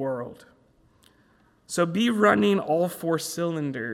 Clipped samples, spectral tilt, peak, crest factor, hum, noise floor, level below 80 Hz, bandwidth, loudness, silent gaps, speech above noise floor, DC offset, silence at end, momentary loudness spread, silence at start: under 0.1%; -5 dB/octave; -6 dBFS; 20 dB; none; -61 dBFS; -68 dBFS; 16 kHz; -24 LUFS; none; 37 dB; under 0.1%; 0 s; 12 LU; 0 s